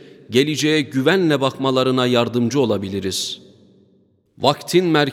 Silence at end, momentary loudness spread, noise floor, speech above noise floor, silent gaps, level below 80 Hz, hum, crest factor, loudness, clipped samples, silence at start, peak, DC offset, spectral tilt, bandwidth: 0 s; 6 LU; -58 dBFS; 40 dB; none; -64 dBFS; none; 18 dB; -18 LUFS; under 0.1%; 0.05 s; 0 dBFS; under 0.1%; -5 dB/octave; 16.5 kHz